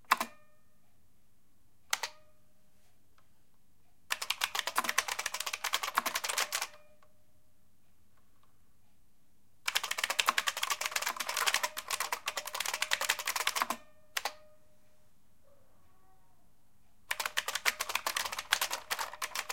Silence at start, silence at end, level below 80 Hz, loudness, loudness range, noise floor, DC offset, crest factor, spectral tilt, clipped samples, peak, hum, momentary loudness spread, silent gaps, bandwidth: 0.1 s; 0 s; -74 dBFS; -33 LUFS; 12 LU; -72 dBFS; 0.2%; 32 dB; 1.5 dB/octave; under 0.1%; -6 dBFS; none; 7 LU; none; 17 kHz